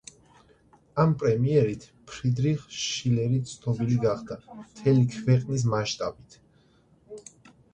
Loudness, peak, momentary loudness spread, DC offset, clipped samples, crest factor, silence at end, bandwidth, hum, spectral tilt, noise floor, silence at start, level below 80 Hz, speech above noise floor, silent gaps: -26 LUFS; -8 dBFS; 18 LU; under 0.1%; under 0.1%; 18 dB; 0.55 s; 9 kHz; none; -6.5 dB/octave; -61 dBFS; 0.95 s; -56 dBFS; 36 dB; none